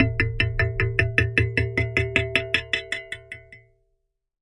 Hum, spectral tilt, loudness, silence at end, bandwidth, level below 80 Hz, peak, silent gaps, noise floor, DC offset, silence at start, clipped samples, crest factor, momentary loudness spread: none; -5.5 dB/octave; -23 LUFS; 0.85 s; 11.5 kHz; -38 dBFS; -2 dBFS; none; -74 dBFS; under 0.1%; 0 s; under 0.1%; 24 dB; 14 LU